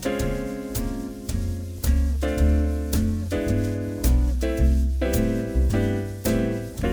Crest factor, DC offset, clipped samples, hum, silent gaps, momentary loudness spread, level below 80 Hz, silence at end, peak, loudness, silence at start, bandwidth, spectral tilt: 14 dB; under 0.1%; under 0.1%; none; none; 7 LU; -26 dBFS; 0 s; -8 dBFS; -25 LUFS; 0 s; over 20 kHz; -6.5 dB/octave